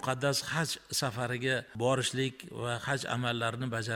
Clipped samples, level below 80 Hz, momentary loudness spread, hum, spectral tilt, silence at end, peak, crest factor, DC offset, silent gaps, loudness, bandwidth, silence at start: under 0.1%; -66 dBFS; 5 LU; none; -4 dB/octave; 0 s; -14 dBFS; 18 dB; under 0.1%; none; -32 LUFS; 17 kHz; 0 s